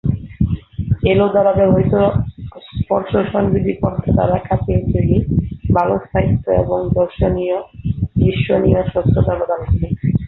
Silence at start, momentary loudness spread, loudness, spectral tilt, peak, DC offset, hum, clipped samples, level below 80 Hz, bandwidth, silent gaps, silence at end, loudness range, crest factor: 0.05 s; 8 LU; -17 LUFS; -11.5 dB/octave; -2 dBFS; under 0.1%; none; under 0.1%; -28 dBFS; 4.1 kHz; none; 0 s; 1 LU; 14 dB